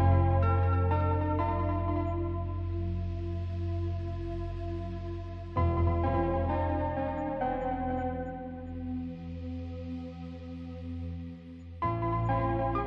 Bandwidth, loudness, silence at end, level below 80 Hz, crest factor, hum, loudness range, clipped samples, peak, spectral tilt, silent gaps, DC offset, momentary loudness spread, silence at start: 5 kHz; -32 LUFS; 0 s; -42 dBFS; 16 dB; none; 8 LU; under 0.1%; -14 dBFS; -10.5 dB/octave; none; under 0.1%; 13 LU; 0 s